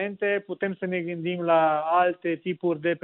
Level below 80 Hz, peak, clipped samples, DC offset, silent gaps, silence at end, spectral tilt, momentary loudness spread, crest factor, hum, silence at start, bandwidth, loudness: -74 dBFS; -8 dBFS; under 0.1%; under 0.1%; none; 0.05 s; -4.5 dB/octave; 8 LU; 16 dB; none; 0 s; 4.1 kHz; -25 LUFS